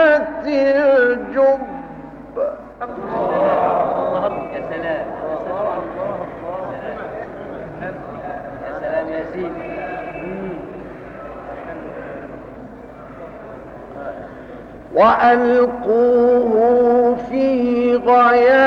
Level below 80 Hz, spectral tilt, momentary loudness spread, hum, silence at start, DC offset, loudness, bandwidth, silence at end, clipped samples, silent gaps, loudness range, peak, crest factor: -48 dBFS; -7.5 dB/octave; 21 LU; none; 0 s; under 0.1%; -17 LUFS; 6.2 kHz; 0 s; under 0.1%; none; 17 LU; -2 dBFS; 16 dB